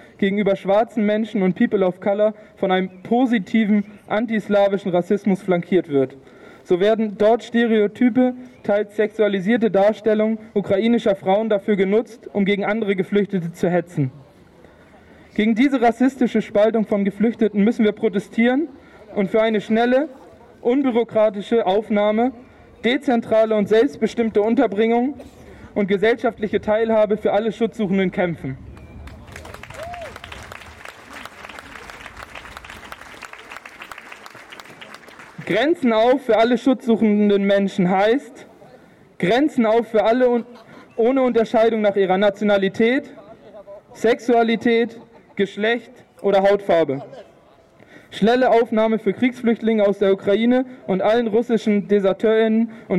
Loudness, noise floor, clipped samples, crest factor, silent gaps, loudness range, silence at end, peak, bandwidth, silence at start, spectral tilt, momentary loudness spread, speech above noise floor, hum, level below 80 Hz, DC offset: -19 LUFS; -51 dBFS; under 0.1%; 12 dB; none; 9 LU; 0 s; -6 dBFS; 12 kHz; 0.2 s; -7 dB/octave; 19 LU; 33 dB; none; -54 dBFS; under 0.1%